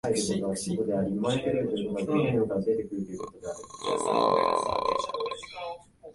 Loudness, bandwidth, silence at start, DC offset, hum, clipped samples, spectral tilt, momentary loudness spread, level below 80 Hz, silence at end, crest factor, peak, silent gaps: -29 LUFS; 11.5 kHz; 0.05 s; under 0.1%; none; under 0.1%; -5 dB/octave; 13 LU; -58 dBFS; 0 s; 20 dB; -10 dBFS; none